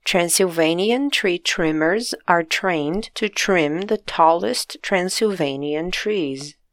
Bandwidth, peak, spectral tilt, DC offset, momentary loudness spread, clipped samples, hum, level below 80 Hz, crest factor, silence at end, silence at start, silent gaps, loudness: 17 kHz; 0 dBFS; -3.5 dB/octave; under 0.1%; 7 LU; under 0.1%; none; -48 dBFS; 20 dB; 0.2 s; 0.05 s; none; -20 LUFS